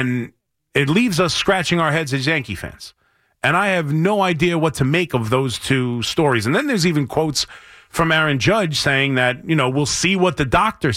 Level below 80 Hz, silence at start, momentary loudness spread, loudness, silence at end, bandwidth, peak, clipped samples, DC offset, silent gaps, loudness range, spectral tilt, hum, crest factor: -44 dBFS; 0 s; 6 LU; -18 LUFS; 0 s; 16 kHz; -4 dBFS; under 0.1%; under 0.1%; none; 2 LU; -4.5 dB/octave; none; 14 dB